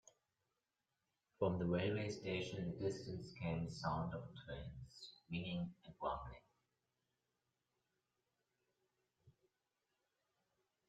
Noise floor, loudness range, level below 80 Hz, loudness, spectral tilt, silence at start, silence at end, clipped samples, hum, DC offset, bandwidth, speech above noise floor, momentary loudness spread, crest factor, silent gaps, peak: under -90 dBFS; 10 LU; -68 dBFS; -44 LUFS; -6.5 dB/octave; 1.4 s; 1.6 s; under 0.1%; none; under 0.1%; 9.2 kHz; over 46 dB; 14 LU; 22 dB; none; -26 dBFS